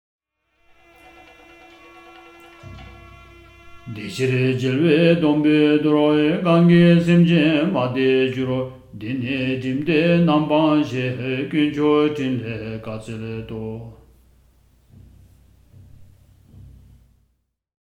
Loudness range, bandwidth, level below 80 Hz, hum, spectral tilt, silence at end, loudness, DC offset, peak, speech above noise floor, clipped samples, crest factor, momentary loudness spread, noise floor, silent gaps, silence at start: 18 LU; 8.8 kHz; -52 dBFS; none; -8 dB/octave; 1.95 s; -18 LUFS; under 0.1%; -2 dBFS; 51 dB; under 0.1%; 18 dB; 16 LU; -69 dBFS; none; 2.65 s